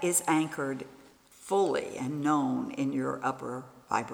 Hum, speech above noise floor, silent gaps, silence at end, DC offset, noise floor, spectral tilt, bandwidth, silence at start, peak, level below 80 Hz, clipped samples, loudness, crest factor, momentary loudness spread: none; 26 dB; none; 0 s; under 0.1%; -55 dBFS; -4.5 dB/octave; over 20 kHz; 0 s; -14 dBFS; -72 dBFS; under 0.1%; -31 LUFS; 18 dB; 13 LU